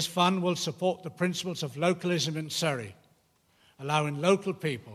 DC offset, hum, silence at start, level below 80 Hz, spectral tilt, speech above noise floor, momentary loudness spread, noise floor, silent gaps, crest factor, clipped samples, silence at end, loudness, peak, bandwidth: under 0.1%; none; 0 s; -74 dBFS; -4.5 dB/octave; 38 dB; 8 LU; -67 dBFS; none; 20 dB; under 0.1%; 0 s; -29 LUFS; -10 dBFS; 15 kHz